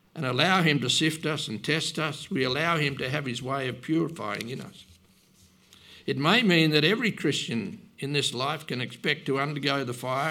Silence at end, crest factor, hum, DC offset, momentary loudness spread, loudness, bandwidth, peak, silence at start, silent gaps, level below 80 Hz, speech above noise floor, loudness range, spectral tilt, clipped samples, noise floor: 0 s; 22 dB; none; under 0.1%; 12 LU; -26 LUFS; 16.5 kHz; -6 dBFS; 0.15 s; none; -68 dBFS; 33 dB; 5 LU; -4.5 dB/octave; under 0.1%; -59 dBFS